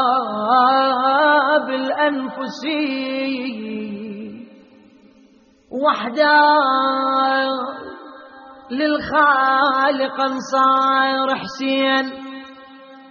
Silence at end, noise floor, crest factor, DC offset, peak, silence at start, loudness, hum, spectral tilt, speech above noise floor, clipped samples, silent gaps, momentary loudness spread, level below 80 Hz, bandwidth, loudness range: 0.05 s; -52 dBFS; 16 dB; under 0.1%; -2 dBFS; 0 s; -17 LUFS; none; -0.5 dB/octave; 34 dB; under 0.1%; none; 16 LU; -62 dBFS; 7 kHz; 9 LU